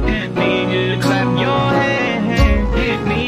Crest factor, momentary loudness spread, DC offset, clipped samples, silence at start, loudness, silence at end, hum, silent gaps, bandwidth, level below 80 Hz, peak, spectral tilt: 14 dB; 3 LU; under 0.1%; under 0.1%; 0 s; -16 LUFS; 0 s; none; none; 14 kHz; -24 dBFS; 0 dBFS; -6.5 dB/octave